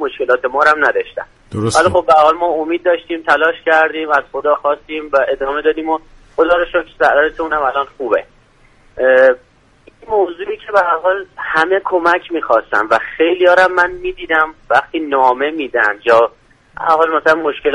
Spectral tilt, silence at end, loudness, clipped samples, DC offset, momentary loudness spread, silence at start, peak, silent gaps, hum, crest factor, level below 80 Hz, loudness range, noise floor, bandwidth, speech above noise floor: -4.5 dB/octave; 0 s; -14 LUFS; under 0.1%; under 0.1%; 9 LU; 0 s; 0 dBFS; none; none; 14 dB; -46 dBFS; 3 LU; -49 dBFS; 11.5 kHz; 35 dB